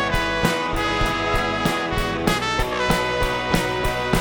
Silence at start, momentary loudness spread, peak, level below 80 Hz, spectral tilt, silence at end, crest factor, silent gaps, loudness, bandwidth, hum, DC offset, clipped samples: 0 s; 2 LU; -2 dBFS; -32 dBFS; -4.5 dB/octave; 0 s; 18 dB; none; -21 LUFS; 19.5 kHz; none; under 0.1%; under 0.1%